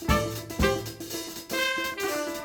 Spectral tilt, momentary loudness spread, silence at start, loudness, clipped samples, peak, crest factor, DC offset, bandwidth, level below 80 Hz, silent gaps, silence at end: -4 dB/octave; 8 LU; 0 s; -29 LUFS; under 0.1%; -8 dBFS; 20 dB; under 0.1%; 19 kHz; -38 dBFS; none; 0 s